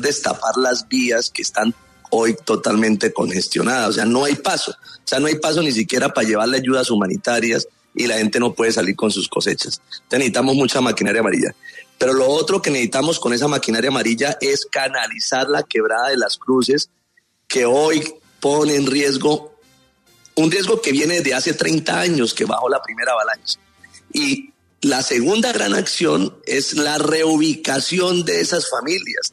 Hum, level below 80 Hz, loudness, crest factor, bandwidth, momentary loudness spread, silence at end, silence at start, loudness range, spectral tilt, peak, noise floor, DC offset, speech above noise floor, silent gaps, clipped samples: none; -62 dBFS; -18 LUFS; 14 dB; 13.5 kHz; 6 LU; 0.05 s; 0 s; 2 LU; -3.5 dB/octave; -6 dBFS; -62 dBFS; under 0.1%; 44 dB; none; under 0.1%